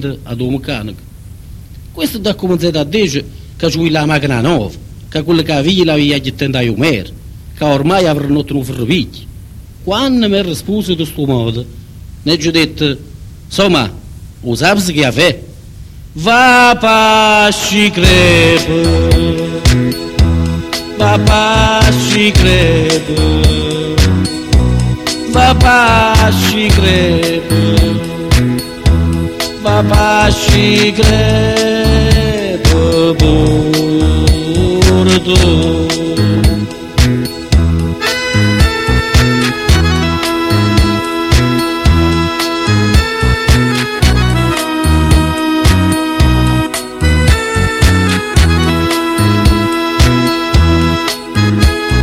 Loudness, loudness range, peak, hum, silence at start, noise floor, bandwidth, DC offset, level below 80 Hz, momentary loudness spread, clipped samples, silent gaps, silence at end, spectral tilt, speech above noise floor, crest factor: -11 LUFS; 5 LU; 0 dBFS; none; 0 s; -31 dBFS; 16 kHz; under 0.1%; -18 dBFS; 9 LU; 0.2%; none; 0 s; -5 dB/octave; 21 dB; 10 dB